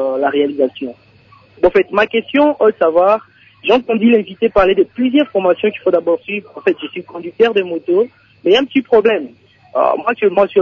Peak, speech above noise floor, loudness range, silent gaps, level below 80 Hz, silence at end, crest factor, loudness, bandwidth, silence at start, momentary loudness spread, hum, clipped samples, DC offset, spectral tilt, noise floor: 0 dBFS; 33 dB; 3 LU; none; -48 dBFS; 0 s; 14 dB; -14 LUFS; 7 kHz; 0 s; 10 LU; none; under 0.1%; under 0.1%; -6.5 dB/octave; -47 dBFS